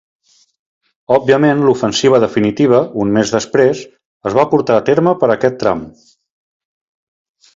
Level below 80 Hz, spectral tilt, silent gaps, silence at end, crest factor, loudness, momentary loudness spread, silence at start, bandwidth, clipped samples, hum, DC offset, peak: -52 dBFS; -5.5 dB/octave; 4.05-4.20 s; 1.65 s; 14 dB; -13 LUFS; 6 LU; 1.1 s; 7.8 kHz; under 0.1%; none; under 0.1%; 0 dBFS